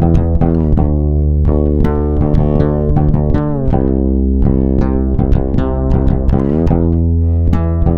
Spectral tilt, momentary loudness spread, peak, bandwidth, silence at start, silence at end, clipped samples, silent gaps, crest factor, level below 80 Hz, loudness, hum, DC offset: -11.5 dB/octave; 2 LU; 0 dBFS; 4.1 kHz; 0 s; 0 s; under 0.1%; none; 12 dB; -16 dBFS; -14 LUFS; none; under 0.1%